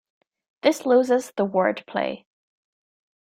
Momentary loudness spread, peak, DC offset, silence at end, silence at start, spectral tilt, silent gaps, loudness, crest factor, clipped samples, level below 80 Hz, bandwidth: 9 LU; -4 dBFS; under 0.1%; 1.05 s; 0.65 s; -5 dB/octave; none; -23 LUFS; 20 dB; under 0.1%; -72 dBFS; 15.5 kHz